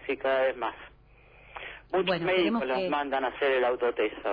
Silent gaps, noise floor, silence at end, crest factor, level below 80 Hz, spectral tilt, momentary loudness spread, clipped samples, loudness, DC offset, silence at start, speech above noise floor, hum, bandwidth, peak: none; -56 dBFS; 0 s; 16 dB; -60 dBFS; -8 dB/octave; 16 LU; under 0.1%; -28 LUFS; under 0.1%; 0 s; 28 dB; 50 Hz at -60 dBFS; 5.2 kHz; -14 dBFS